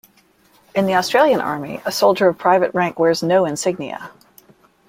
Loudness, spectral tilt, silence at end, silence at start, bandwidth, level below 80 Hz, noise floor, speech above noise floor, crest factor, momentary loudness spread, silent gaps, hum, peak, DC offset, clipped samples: -17 LUFS; -4.5 dB/octave; 0.8 s; 0.75 s; 16.5 kHz; -62 dBFS; -55 dBFS; 38 dB; 18 dB; 11 LU; none; none; -2 dBFS; under 0.1%; under 0.1%